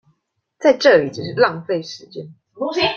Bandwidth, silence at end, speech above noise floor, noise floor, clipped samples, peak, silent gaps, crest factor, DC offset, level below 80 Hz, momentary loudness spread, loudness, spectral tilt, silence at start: 7 kHz; 0 s; 51 dB; -68 dBFS; under 0.1%; -2 dBFS; none; 18 dB; under 0.1%; -62 dBFS; 19 LU; -17 LUFS; -4.5 dB/octave; 0.6 s